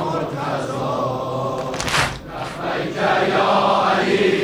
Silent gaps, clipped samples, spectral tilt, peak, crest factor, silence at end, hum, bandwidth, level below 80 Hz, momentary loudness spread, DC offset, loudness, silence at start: none; under 0.1%; -4.5 dB/octave; -4 dBFS; 14 dB; 0 s; none; 19 kHz; -46 dBFS; 8 LU; under 0.1%; -20 LUFS; 0 s